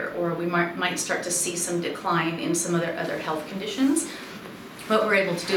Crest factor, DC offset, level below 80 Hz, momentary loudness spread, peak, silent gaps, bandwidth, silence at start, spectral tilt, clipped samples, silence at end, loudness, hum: 18 dB; under 0.1%; -66 dBFS; 11 LU; -8 dBFS; none; 17.5 kHz; 0 s; -3.5 dB/octave; under 0.1%; 0 s; -25 LUFS; none